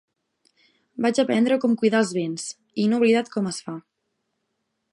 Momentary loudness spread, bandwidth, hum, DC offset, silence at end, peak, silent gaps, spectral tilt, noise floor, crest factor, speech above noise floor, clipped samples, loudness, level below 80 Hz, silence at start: 13 LU; 11 kHz; none; under 0.1%; 1.1 s; -8 dBFS; none; -5 dB/octave; -76 dBFS; 18 dB; 55 dB; under 0.1%; -22 LUFS; -74 dBFS; 1 s